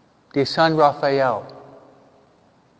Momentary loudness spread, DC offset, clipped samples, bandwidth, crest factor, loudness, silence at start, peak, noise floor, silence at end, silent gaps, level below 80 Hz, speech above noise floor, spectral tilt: 12 LU; under 0.1%; under 0.1%; 8 kHz; 20 dB; -19 LUFS; 0.35 s; -2 dBFS; -56 dBFS; 1.2 s; none; -62 dBFS; 38 dB; -6 dB/octave